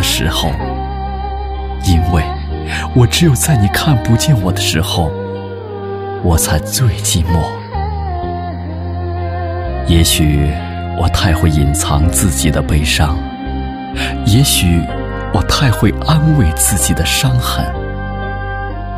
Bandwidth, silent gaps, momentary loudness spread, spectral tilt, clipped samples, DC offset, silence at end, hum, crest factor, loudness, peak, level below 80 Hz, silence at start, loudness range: 16 kHz; none; 11 LU; -4.5 dB/octave; under 0.1%; under 0.1%; 0 s; none; 14 dB; -14 LUFS; 0 dBFS; -22 dBFS; 0 s; 4 LU